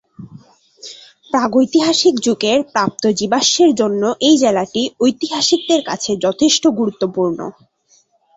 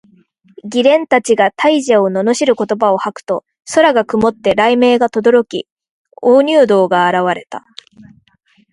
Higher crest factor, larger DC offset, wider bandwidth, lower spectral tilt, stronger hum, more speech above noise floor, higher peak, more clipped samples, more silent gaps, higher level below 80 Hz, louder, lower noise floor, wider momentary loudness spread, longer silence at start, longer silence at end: about the same, 14 dB vs 14 dB; neither; second, 8 kHz vs 11.5 kHz; about the same, -3.5 dB/octave vs -4.5 dB/octave; neither; about the same, 41 dB vs 43 dB; about the same, -2 dBFS vs 0 dBFS; neither; second, none vs 5.72-5.77 s, 5.89-6.05 s; about the same, -58 dBFS vs -54 dBFS; about the same, -15 LUFS vs -13 LUFS; about the same, -56 dBFS vs -55 dBFS; second, 8 LU vs 11 LU; second, 0.2 s vs 0.65 s; second, 0.85 s vs 1.15 s